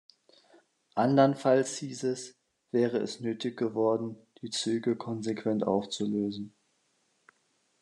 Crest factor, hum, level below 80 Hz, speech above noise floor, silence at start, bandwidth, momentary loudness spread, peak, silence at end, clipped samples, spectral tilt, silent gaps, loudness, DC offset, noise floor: 22 dB; none; -80 dBFS; 44 dB; 0.95 s; 11 kHz; 14 LU; -10 dBFS; 1.35 s; under 0.1%; -5.5 dB/octave; none; -30 LUFS; under 0.1%; -73 dBFS